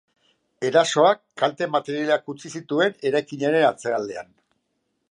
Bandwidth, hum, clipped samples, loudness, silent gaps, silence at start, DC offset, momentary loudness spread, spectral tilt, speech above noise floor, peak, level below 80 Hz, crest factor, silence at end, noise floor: 10.5 kHz; none; under 0.1%; -22 LUFS; none; 0.6 s; under 0.1%; 11 LU; -4 dB/octave; 52 dB; -4 dBFS; -76 dBFS; 20 dB; 0.9 s; -74 dBFS